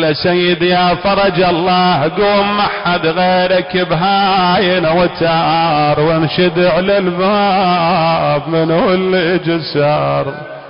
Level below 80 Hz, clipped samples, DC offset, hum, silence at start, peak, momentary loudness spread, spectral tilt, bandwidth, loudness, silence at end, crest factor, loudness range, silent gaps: -42 dBFS; under 0.1%; under 0.1%; none; 0 s; -4 dBFS; 3 LU; -10.5 dB/octave; 5.4 kHz; -12 LUFS; 0 s; 8 dB; 1 LU; none